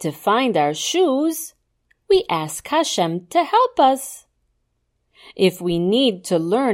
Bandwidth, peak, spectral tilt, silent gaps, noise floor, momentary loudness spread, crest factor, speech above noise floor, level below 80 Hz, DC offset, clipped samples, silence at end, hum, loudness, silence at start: 16.5 kHz; -4 dBFS; -4.5 dB/octave; none; -70 dBFS; 7 LU; 16 dB; 51 dB; -56 dBFS; under 0.1%; under 0.1%; 0 s; 60 Hz at -65 dBFS; -19 LUFS; 0 s